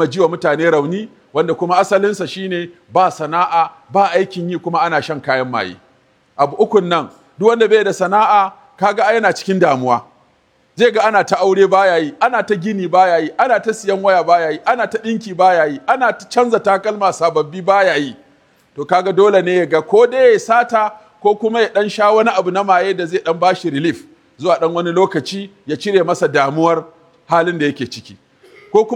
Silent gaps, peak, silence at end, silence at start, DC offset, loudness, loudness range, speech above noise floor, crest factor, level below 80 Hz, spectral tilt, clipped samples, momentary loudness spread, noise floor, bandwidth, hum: none; 0 dBFS; 0 s; 0 s; under 0.1%; -15 LUFS; 3 LU; 42 dB; 14 dB; -66 dBFS; -5 dB/octave; under 0.1%; 10 LU; -56 dBFS; 11.5 kHz; none